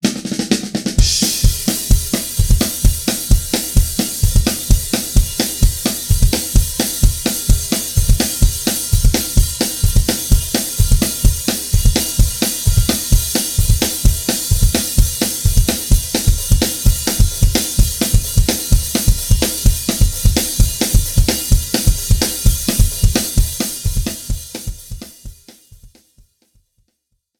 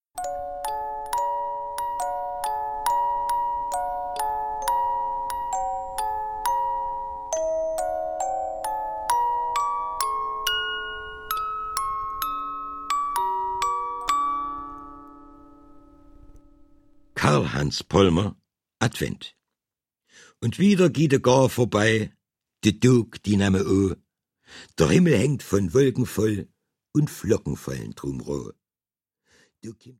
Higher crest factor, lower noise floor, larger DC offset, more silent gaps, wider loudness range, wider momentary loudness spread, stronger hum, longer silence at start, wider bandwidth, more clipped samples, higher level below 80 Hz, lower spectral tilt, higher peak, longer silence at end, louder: second, 14 dB vs 22 dB; second, -70 dBFS vs under -90 dBFS; neither; neither; second, 2 LU vs 7 LU; second, 3 LU vs 13 LU; neither; about the same, 0.05 s vs 0.15 s; first, 19 kHz vs 17 kHz; neither; first, -18 dBFS vs -48 dBFS; second, -4 dB/octave vs -5.5 dB/octave; about the same, 0 dBFS vs -2 dBFS; first, 1.55 s vs 0.1 s; first, -16 LUFS vs -25 LUFS